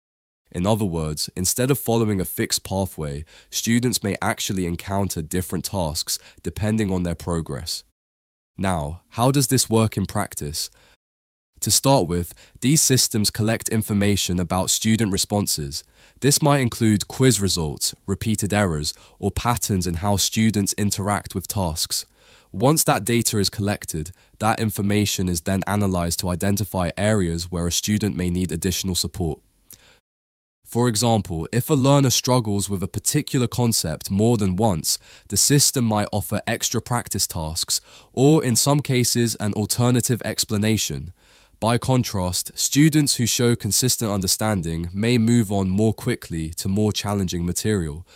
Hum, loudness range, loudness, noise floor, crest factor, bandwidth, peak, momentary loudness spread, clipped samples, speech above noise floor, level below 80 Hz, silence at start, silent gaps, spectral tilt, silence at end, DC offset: none; 4 LU; -21 LUFS; -50 dBFS; 18 dB; 16.5 kHz; -4 dBFS; 10 LU; under 0.1%; 29 dB; -44 dBFS; 0.55 s; 7.92-8.54 s, 10.96-11.53 s, 30.00-30.62 s; -4.5 dB/octave; 0.15 s; under 0.1%